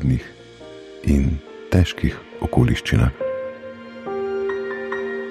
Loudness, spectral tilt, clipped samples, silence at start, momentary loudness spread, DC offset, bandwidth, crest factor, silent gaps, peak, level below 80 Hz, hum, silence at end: -22 LUFS; -7 dB/octave; under 0.1%; 0 s; 18 LU; under 0.1%; 13.5 kHz; 20 dB; none; -2 dBFS; -30 dBFS; none; 0 s